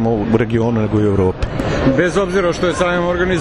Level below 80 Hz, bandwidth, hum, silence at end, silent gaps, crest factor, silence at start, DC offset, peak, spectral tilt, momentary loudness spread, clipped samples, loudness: -30 dBFS; 11.5 kHz; none; 0 s; none; 16 dB; 0 s; under 0.1%; 0 dBFS; -6.5 dB/octave; 2 LU; under 0.1%; -16 LUFS